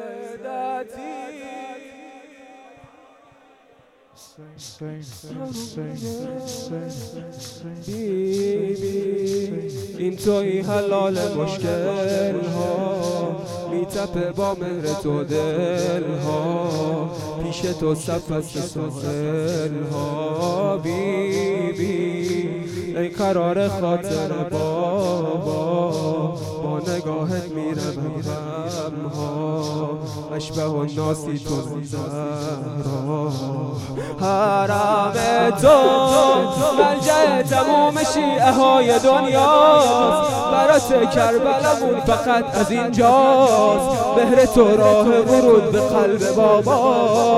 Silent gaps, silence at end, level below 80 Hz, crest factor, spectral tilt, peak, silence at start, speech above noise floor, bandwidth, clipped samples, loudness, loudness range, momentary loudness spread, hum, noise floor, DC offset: none; 0 s; -48 dBFS; 18 dB; -5.5 dB/octave; -2 dBFS; 0 s; 35 dB; 15.5 kHz; under 0.1%; -19 LUFS; 13 LU; 17 LU; none; -54 dBFS; under 0.1%